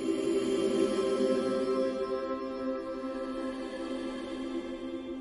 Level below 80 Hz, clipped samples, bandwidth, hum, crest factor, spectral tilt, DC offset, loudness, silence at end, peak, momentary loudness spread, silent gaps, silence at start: -60 dBFS; under 0.1%; 11.5 kHz; none; 16 dB; -5 dB/octave; under 0.1%; -32 LUFS; 0 s; -16 dBFS; 9 LU; none; 0 s